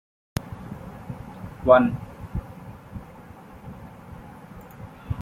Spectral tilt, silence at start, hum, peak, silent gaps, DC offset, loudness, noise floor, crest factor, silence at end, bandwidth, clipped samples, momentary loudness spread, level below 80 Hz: -7.5 dB/octave; 0.35 s; none; -2 dBFS; none; under 0.1%; -24 LUFS; -45 dBFS; 26 dB; 0 s; 15.5 kHz; under 0.1%; 26 LU; -46 dBFS